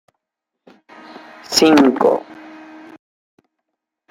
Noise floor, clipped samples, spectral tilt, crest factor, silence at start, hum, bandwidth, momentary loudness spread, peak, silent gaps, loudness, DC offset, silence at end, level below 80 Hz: -81 dBFS; under 0.1%; -3.5 dB/octave; 20 dB; 1.5 s; none; 16 kHz; 27 LU; 0 dBFS; none; -14 LUFS; under 0.1%; 1.8 s; -60 dBFS